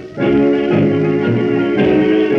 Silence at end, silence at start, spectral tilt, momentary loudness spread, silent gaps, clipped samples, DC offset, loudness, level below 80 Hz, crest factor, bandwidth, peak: 0 s; 0 s; -9 dB/octave; 2 LU; none; under 0.1%; under 0.1%; -14 LUFS; -44 dBFS; 12 dB; 6.6 kHz; -2 dBFS